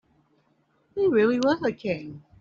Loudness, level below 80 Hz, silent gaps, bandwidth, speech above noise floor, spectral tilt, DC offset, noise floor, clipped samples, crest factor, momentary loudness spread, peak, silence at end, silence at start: -24 LUFS; -64 dBFS; none; 7.4 kHz; 43 dB; -5 dB/octave; under 0.1%; -67 dBFS; under 0.1%; 16 dB; 15 LU; -10 dBFS; 0.2 s; 0.95 s